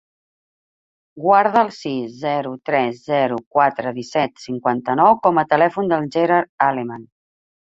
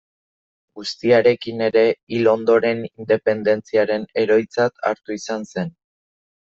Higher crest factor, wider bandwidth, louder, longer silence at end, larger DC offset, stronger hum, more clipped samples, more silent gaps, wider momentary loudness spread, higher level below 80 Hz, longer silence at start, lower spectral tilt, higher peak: about the same, 18 dB vs 16 dB; about the same, 7.8 kHz vs 7.8 kHz; about the same, -18 LUFS vs -19 LUFS; about the same, 0.7 s vs 0.8 s; neither; neither; neither; first, 3.46-3.51 s, 6.49-6.58 s vs 2.03-2.07 s; about the same, 10 LU vs 12 LU; about the same, -64 dBFS vs -64 dBFS; first, 1.15 s vs 0.75 s; about the same, -6.5 dB/octave vs -5.5 dB/octave; about the same, -2 dBFS vs -2 dBFS